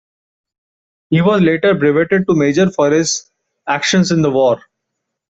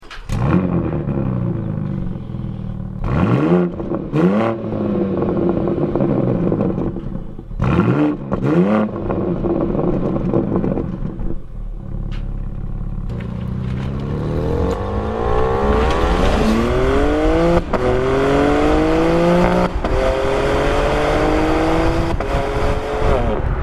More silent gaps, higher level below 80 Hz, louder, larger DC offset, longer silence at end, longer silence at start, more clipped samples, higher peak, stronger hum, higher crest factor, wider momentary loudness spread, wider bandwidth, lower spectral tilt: neither; second, -54 dBFS vs -24 dBFS; first, -14 LUFS vs -18 LUFS; neither; first, 0.7 s vs 0 s; first, 1.1 s vs 0 s; neither; about the same, -2 dBFS vs 0 dBFS; neither; about the same, 12 dB vs 16 dB; second, 7 LU vs 12 LU; second, 8.2 kHz vs 12.5 kHz; second, -5 dB/octave vs -7.5 dB/octave